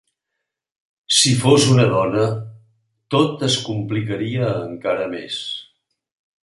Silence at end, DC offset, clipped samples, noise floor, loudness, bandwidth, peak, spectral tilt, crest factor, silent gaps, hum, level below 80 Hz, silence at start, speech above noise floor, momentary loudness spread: 0.8 s; under 0.1%; under 0.1%; -80 dBFS; -18 LUFS; 11.5 kHz; -2 dBFS; -4.5 dB/octave; 18 dB; none; none; -56 dBFS; 1.1 s; 62 dB; 13 LU